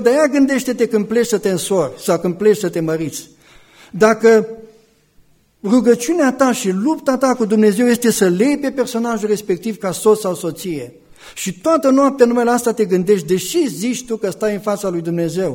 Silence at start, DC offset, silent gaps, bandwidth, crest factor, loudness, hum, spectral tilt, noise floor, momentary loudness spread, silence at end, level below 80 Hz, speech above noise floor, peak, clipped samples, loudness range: 0 s; under 0.1%; none; 18 kHz; 16 dB; -16 LUFS; none; -5 dB/octave; -52 dBFS; 10 LU; 0 s; -56 dBFS; 37 dB; 0 dBFS; under 0.1%; 3 LU